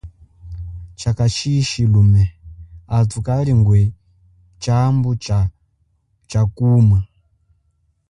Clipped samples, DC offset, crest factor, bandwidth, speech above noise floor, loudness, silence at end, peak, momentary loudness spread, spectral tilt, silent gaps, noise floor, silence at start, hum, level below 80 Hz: under 0.1%; under 0.1%; 14 dB; 10.5 kHz; 49 dB; -17 LUFS; 1.05 s; -4 dBFS; 16 LU; -7 dB/octave; none; -63 dBFS; 0.05 s; none; -34 dBFS